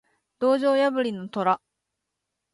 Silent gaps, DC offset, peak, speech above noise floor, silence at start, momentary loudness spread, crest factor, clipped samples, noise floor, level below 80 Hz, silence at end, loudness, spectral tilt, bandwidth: none; under 0.1%; -8 dBFS; 59 dB; 0.4 s; 7 LU; 16 dB; under 0.1%; -82 dBFS; -76 dBFS; 0.95 s; -24 LUFS; -6 dB/octave; 11.5 kHz